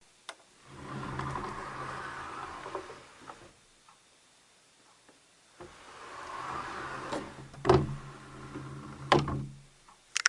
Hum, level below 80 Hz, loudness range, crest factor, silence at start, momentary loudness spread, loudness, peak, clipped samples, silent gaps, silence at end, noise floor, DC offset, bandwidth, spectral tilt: none; -56 dBFS; 17 LU; 32 dB; 0.3 s; 22 LU; -35 LUFS; -4 dBFS; under 0.1%; none; 0 s; -63 dBFS; under 0.1%; 11.5 kHz; -4.5 dB/octave